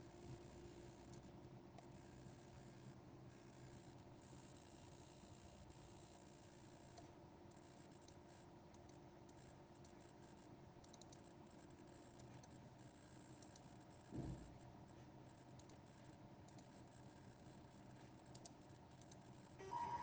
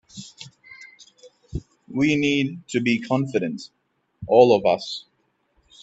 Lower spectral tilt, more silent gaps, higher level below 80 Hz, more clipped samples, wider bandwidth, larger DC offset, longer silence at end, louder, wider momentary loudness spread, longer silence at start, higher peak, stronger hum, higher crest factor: about the same, -5.5 dB/octave vs -6 dB/octave; neither; second, -74 dBFS vs -52 dBFS; neither; first, over 20 kHz vs 8.2 kHz; neither; second, 0 s vs 0.85 s; second, -61 LUFS vs -21 LUFS; second, 4 LU vs 26 LU; second, 0 s vs 0.15 s; second, -38 dBFS vs -2 dBFS; neither; about the same, 22 dB vs 22 dB